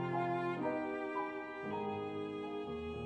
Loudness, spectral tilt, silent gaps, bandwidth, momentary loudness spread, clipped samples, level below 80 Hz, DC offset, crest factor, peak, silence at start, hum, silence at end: -40 LUFS; -8 dB/octave; none; 8.8 kHz; 6 LU; under 0.1%; -64 dBFS; under 0.1%; 14 dB; -26 dBFS; 0 s; none; 0 s